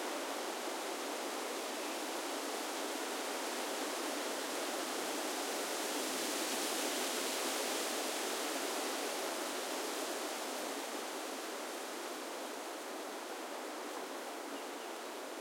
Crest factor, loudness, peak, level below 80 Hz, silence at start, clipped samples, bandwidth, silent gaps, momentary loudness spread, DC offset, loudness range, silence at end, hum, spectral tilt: 16 dB; -39 LUFS; -24 dBFS; under -90 dBFS; 0 s; under 0.1%; 16.5 kHz; none; 8 LU; under 0.1%; 7 LU; 0 s; none; 0 dB/octave